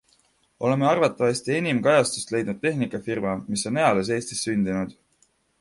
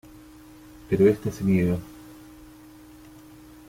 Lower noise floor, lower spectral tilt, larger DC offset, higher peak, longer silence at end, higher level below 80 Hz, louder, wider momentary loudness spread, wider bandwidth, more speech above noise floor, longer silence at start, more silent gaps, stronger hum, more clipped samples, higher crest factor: first, -65 dBFS vs -48 dBFS; second, -5 dB/octave vs -8 dB/octave; neither; first, -4 dBFS vs -8 dBFS; second, 0.7 s vs 1.55 s; second, -58 dBFS vs -52 dBFS; about the same, -24 LUFS vs -23 LUFS; second, 8 LU vs 25 LU; second, 11.5 kHz vs 16 kHz; first, 42 dB vs 26 dB; second, 0.6 s vs 0.9 s; neither; neither; neither; about the same, 20 dB vs 20 dB